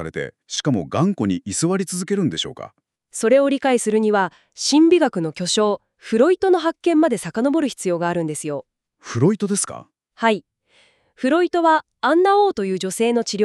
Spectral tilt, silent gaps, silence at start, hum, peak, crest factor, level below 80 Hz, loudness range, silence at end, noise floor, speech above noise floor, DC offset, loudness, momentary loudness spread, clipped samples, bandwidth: -4.5 dB/octave; none; 0 s; none; -4 dBFS; 16 dB; -60 dBFS; 5 LU; 0 s; -58 dBFS; 39 dB; under 0.1%; -19 LUFS; 11 LU; under 0.1%; 13 kHz